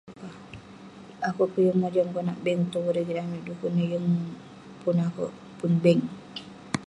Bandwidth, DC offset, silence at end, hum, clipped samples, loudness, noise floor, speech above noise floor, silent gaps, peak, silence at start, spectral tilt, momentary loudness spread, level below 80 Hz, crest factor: 10.5 kHz; under 0.1%; 0 s; none; under 0.1%; -27 LUFS; -46 dBFS; 21 dB; none; -8 dBFS; 0.05 s; -7.5 dB/octave; 21 LU; -66 dBFS; 20 dB